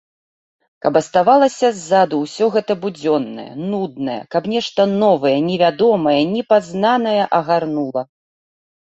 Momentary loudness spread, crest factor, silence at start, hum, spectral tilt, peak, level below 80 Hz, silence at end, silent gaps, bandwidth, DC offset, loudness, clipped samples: 9 LU; 16 dB; 0.85 s; none; -5.5 dB/octave; -2 dBFS; -62 dBFS; 0.95 s; none; 8.2 kHz; under 0.1%; -17 LUFS; under 0.1%